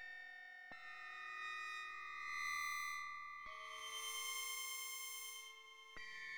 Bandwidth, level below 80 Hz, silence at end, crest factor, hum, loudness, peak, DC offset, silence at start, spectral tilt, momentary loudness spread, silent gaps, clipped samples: over 20 kHz; -82 dBFS; 0 s; 16 dB; none; -47 LUFS; -32 dBFS; under 0.1%; 0 s; 2.5 dB/octave; 11 LU; none; under 0.1%